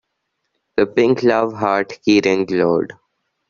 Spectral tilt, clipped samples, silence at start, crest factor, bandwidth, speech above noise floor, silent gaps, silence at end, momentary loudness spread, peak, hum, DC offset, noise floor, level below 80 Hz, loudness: -4.5 dB/octave; under 0.1%; 0.75 s; 16 dB; 7.2 kHz; 58 dB; none; 0.55 s; 6 LU; -2 dBFS; none; under 0.1%; -74 dBFS; -58 dBFS; -17 LUFS